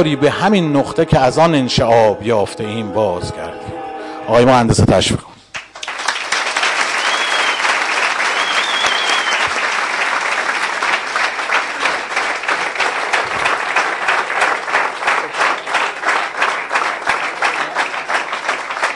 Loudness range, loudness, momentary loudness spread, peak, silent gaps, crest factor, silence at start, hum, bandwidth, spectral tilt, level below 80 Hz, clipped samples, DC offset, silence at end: 2 LU; -15 LUFS; 8 LU; -2 dBFS; none; 14 dB; 0 s; none; 11.5 kHz; -4 dB/octave; -44 dBFS; under 0.1%; under 0.1%; 0 s